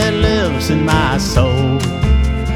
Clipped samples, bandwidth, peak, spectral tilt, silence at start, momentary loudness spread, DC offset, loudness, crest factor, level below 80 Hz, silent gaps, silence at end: under 0.1%; 14.5 kHz; 0 dBFS; -5.5 dB/octave; 0 s; 2 LU; under 0.1%; -15 LUFS; 14 dB; -20 dBFS; none; 0 s